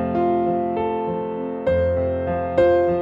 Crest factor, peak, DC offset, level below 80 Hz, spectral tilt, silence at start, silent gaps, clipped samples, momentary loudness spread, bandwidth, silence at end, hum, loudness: 14 dB; -6 dBFS; under 0.1%; -42 dBFS; -9.5 dB/octave; 0 s; none; under 0.1%; 8 LU; 5.2 kHz; 0 s; none; -21 LUFS